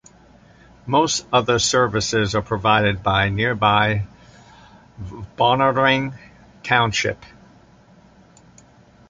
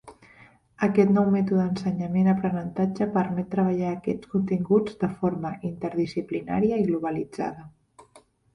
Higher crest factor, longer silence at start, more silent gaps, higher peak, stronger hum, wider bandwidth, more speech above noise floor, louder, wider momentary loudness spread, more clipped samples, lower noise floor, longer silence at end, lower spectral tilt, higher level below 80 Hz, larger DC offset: about the same, 20 dB vs 18 dB; first, 0.85 s vs 0.05 s; neither; first, -2 dBFS vs -6 dBFS; neither; first, 9.6 kHz vs 6.2 kHz; about the same, 31 dB vs 33 dB; first, -19 LUFS vs -25 LUFS; first, 18 LU vs 9 LU; neither; second, -50 dBFS vs -57 dBFS; first, 1.85 s vs 0.5 s; second, -4 dB/octave vs -9 dB/octave; first, -44 dBFS vs -58 dBFS; neither